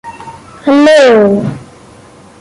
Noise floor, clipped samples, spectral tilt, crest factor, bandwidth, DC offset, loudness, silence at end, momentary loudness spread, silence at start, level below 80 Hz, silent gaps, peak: -37 dBFS; under 0.1%; -5.5 dB/octave; 10 dB; 11.5 kHz; under 0.1%; -7 LUFS; 0.75 s; 24 LU; 0.05 s; -48 dBFS; none; 0 dBFS